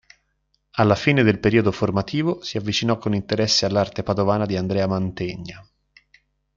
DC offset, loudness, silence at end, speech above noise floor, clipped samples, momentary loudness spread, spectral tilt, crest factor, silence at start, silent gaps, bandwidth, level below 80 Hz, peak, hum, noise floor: under 0.1%; -21 LUFS; 0.95 s; 49 dB; under 0.1%; 10 LU; -5.5 dB/octave; 18 dB; 0.75 s; none; 7.6 kHz; -52 dBFS; -2 dBFS; none; -70 dBFS